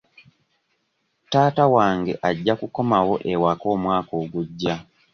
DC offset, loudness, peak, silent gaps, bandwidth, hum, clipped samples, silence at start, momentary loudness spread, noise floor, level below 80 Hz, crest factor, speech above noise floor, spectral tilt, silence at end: under 0.1%; -21 LUFS; -2 dBFS; none; 6.8 kHz; none; under 0.1%; 1.3 s; 10 LU; -71 dBFS; -54 dBFS; 20 dB; 51 dB; -7 dB/octave; 0.3 s